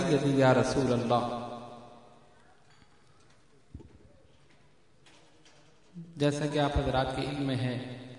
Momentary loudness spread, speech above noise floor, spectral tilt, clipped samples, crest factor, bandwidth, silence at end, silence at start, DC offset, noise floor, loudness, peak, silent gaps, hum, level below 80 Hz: 25 LU; 36 dB; -6.5 dB/octave; under 0.1%; 20 dB; 11 kHz; 0 s; 0 s; under 0.1%; -64 dBFS; -29 LUFS; -12 dBFS; none; none; -50 dBFS